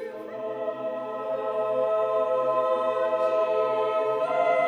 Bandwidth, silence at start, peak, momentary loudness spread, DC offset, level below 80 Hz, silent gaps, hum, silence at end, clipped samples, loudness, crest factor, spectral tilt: 9.2 kHz; 0 s; -12 dBFS; 8 LU; under 0.1%; -78 dBFS; none; none; 0 s; under 0.1%; -26 LUFS; 14 dB; -5.5 dB/octave